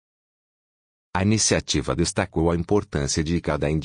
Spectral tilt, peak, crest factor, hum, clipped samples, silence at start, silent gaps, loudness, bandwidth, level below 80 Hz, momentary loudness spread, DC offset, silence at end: -4.5 dB/octave; -6 dBFS; 18 dB; none; under 0.1%; 1.15 s; none; -23 LUFS; 10 kHz; -42 dBFS; 5 LU; under 0.1%; 0 s